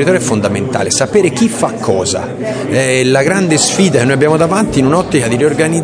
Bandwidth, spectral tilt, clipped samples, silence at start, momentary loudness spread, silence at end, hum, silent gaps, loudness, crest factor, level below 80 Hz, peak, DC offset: 11 kHz; -4.5 dB/octave; 0.3%; 0 s; 5 LU; 0 s; none; none; -12 LUFS; 12 dB; -42 dBFS; 0 dBFS; under 0.1%